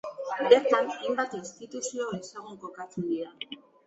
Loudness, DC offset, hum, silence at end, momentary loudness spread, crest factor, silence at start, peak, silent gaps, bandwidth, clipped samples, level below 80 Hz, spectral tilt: -28 LUFS; under 0.1%; none; 0.3 s; 20 LU; 24 dB; 0.05 s; -6 dBFS; none; 8 kHz; under 0.1%; -74 dBFS; -4 dB/octave